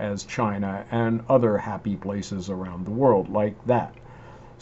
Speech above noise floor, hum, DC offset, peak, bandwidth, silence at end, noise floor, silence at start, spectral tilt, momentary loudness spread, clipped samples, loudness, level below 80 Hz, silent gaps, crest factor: 21 dB; none; under 0.1%; -6 dBFS; 8 kHz; 0 s; -45 dBFS; 0 s; -7.5 dB/octave; 10 LU; under 0.1%; -25 LUFS; -54 dBFS; none; 18 dB